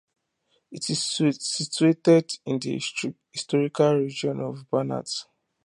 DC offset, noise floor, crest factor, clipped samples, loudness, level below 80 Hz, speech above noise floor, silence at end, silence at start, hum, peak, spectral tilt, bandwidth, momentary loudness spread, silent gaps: under 0.1%; -71 dBFS; 18 dB; under 0.1%; -25 LUFS; -72 dBFS; 47 dB; 0.4 s; 0.7 s; none; -6 dBFS; -5 dB/octave; 11.5 kHz; 12 LU; none